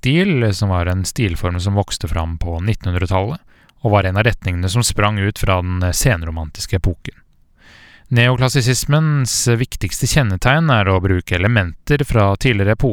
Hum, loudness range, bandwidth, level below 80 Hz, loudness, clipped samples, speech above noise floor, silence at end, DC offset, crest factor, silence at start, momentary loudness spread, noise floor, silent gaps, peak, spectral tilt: none; 4 LU; 18.5 kHz; -32 dBFS; -17 LUFS; under 0.1%; 32 dB; 0 s; under 0.1%; 16 dB; 0.05 s; 8 LU; -48 dBFS; none; 0 dBFS; -5 dB/octave